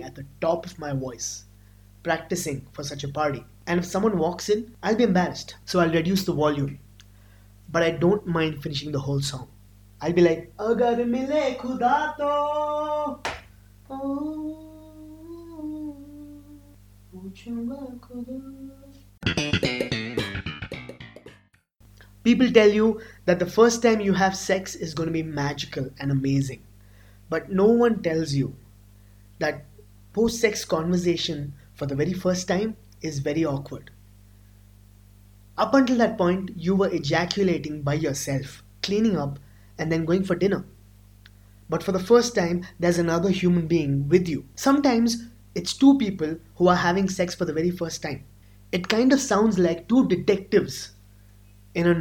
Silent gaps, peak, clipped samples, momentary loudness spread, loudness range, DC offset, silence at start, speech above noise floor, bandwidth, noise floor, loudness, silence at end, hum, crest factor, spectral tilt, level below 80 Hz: none; 0 dBFS; under 0.1%; 17 LU; 8 LU; under 0.1%; 0 s; 35 dB; 18.5 kHz; -58 dBFS; -24 LUFS; 0 s; 50 Hz at -50 dBFS; 24 dB; -5.5 dB/octave; -50 dBFS